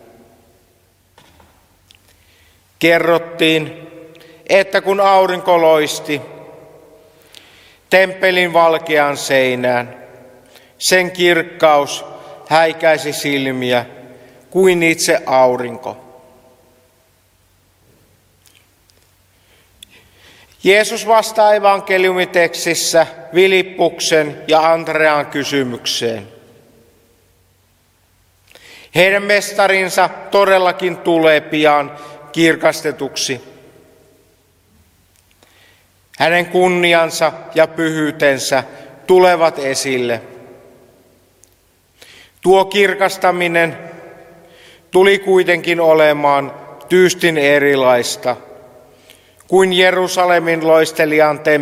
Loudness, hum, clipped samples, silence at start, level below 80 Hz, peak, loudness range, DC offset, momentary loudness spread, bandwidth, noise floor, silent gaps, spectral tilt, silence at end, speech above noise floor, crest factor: -13 LUFS; none; under 0.1%; 2.8 s; -60 dBFS; 0 dBFS; 7 LU; under 0.1%; 10 LU; 16 kHz; -56 dBFS; none; -3.5 dB/octave; 0 s; 42 dB; 16 dB